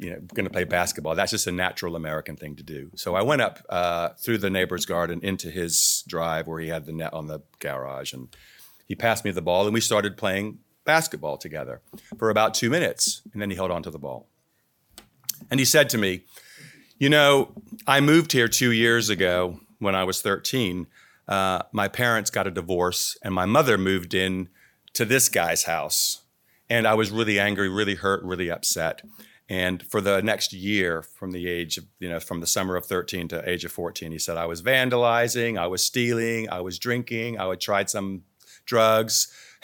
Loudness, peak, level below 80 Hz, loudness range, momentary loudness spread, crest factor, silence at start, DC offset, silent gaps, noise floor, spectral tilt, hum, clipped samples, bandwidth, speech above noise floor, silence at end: -24 LUFS; -2 dBFS; -58 dBFS; 6 LU; 14 LU; 24 dB; 0 s; under 0.1%; none; -69 dBFS; -3 dB/octave; none; under 0.1%; 19 kHz; 45 dB; 0.2 s